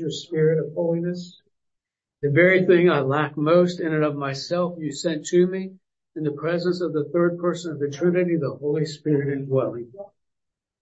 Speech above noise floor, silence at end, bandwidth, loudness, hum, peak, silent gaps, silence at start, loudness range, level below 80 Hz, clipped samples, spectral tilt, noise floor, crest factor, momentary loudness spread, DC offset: 62 dB; 0.75 s; 8 kHz; -22 LUFS; none; -4 dBFS; none; 0 s; 4 LU; -70 dBFS; under 0.1%; -6.5 dB/octave; -84 dBFS; 18 dB; 13 LU; under 0.1%